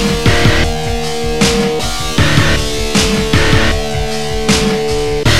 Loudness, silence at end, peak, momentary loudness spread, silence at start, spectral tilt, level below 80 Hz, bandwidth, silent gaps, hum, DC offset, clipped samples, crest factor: -13 LUFS; 0 s; 0 dBFS; 7 LU; 0 s; -4 dB/octave; -22 dBFS; 16.5 kHz; none; none; 8%; under 0.1%; 14 dB